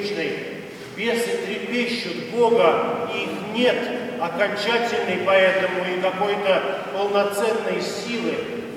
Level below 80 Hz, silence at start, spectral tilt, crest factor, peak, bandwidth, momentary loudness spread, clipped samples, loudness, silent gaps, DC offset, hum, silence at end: -66 dBFS; 0 s; -4 dB/octave; 20 dB; -2 dBFS; 16 kHz; 9 LU; under 0.1%; -22 LUFS; none; under 0.1%; none; 0 s